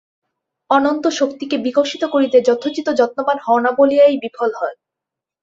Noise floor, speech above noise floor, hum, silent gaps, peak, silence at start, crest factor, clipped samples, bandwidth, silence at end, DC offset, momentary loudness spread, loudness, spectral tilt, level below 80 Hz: -84 dBFS; 69 dB; none; none; -2 dBFS; 0.7 s; 16 dB; under 0.1%; 7.8 kHz; 0.7 s; under 0.1%; 8 LU; -16 LUFS; -3.5 dB/octave; -64 dBFS